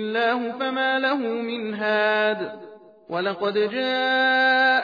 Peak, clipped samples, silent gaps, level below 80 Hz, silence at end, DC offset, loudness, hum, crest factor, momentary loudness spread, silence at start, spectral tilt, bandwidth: -8 dBFS; under 0.1%; none; -80 dBFS; 0 s; under 0.1%; -22 LUFS; none; 14 dB; 11 LU; 0 s; -5.5 dB/octave; 5 kHz